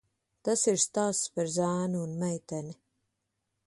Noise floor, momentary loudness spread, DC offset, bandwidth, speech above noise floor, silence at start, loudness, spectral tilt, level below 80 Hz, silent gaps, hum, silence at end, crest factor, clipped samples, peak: -82 dBFS; 12 LU; under 0.1%; 11.5 kHz; 52 dB; 0.45 s; -30 LUFS; -4.5 dB/octave; -72 dBFS; none; none; 0.95 s; 18 dB; under 0.1%; -14 dBFS